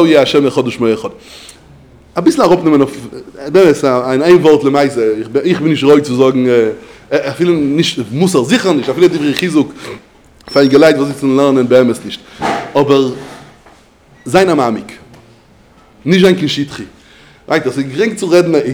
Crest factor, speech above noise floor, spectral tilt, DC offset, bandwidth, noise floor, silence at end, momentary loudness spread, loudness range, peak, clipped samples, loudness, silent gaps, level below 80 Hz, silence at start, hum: 12 dB; 33 dB; -5.5 dB/octave; under 0.1%; over 20 kHz; -44 dBFS; 0 s; 15 LU; 5 LU; 0 dBFS; 0.6%; -11 LUFS; none; -50 dBFS; 0 s; none